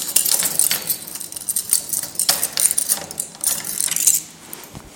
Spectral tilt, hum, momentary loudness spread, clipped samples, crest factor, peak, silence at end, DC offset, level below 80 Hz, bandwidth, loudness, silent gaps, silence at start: 1 dB/octave; none; 13 LU; under 0.1%; 22 dB; 0 dBFS; 0 s; under 0.1%; -58 dBFS; 17 kHz; -18 LUFS; none; 0 s